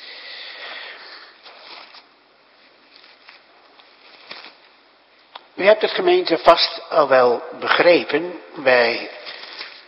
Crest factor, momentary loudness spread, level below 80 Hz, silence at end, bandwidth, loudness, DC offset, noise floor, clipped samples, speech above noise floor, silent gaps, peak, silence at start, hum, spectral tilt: 20 dB; 24 LU; -62 dBFS; 0.15 s; 7 kHz; -17 LUFS; under 0.1%; -54 dBFS; under 0.1%; 37 dB; none; 0 dBFS; 0 s; none; -5.5 dB/octave